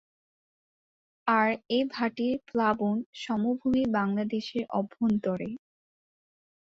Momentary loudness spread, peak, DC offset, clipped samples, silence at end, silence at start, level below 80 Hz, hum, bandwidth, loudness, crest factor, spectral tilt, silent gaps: 7 LU; -12 dBFS; under 0.1%; under 0.1%; 1.1 s; 1.25 s; -64 dBFS; none; 7.6 kHz; -29 LUFS; 18 dB; -7 dB/octave; 3.06-3.13 s